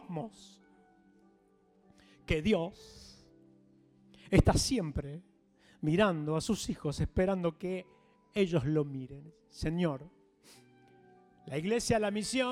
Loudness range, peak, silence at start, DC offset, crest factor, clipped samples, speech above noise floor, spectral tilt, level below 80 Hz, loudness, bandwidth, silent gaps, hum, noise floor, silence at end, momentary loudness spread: 7 LU; -10 dBFS; 0 s; under 0.1%; 24 dB; under 0.1%; 35 dB; -5.5 dB/octave; -46 dBFS; -32 LUFS; 16 kHz; none; none; -67 dBFS; 0 s; 18 LU